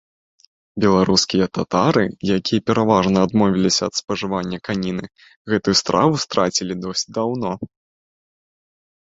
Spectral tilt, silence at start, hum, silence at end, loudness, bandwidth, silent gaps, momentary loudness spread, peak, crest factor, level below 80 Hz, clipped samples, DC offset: -4.5 dB/octave; 0.75 s; none; 1.55 s; -19 LUFS; 7.8 kHz; 4.04-4.08 s, 5.36-5.45 s; 9 LU; -2 dBFS; 18 dB; -50 dBFS; under 0.1%; under 0.1%